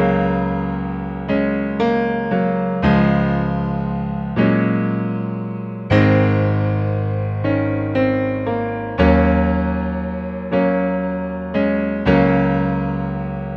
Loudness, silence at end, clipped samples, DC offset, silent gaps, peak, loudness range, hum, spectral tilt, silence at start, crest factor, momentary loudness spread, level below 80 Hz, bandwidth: -19 LUFS; 0 s; under 0.1%; under 0.1%; none; -2 dBFS; 1 LU; none; -9.5 dB/octave; 0 s; 16 dB; 9 LU; -32 dBFS; 6 kHz